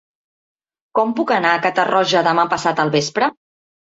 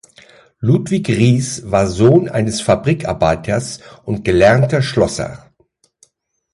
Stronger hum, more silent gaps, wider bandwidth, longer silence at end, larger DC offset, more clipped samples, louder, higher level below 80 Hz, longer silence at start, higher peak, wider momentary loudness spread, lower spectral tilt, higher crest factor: neither; neither; second, 8 kHz vs 11.5 kHz; second, 0.65 s vs 1.15 s; neither; neither; about the same, -17 LUFS vs -15 LUFS; second, -62 dBFS vs -38 dBFS; first, 0.95 s vs 0.6 s; about the same, -2 dBFS vs 0 dBFS; second, 5 LU vs 11 LU; second, -4 dB/octave vs -6 dB/octave; about the same, 16 dB vs 16 dB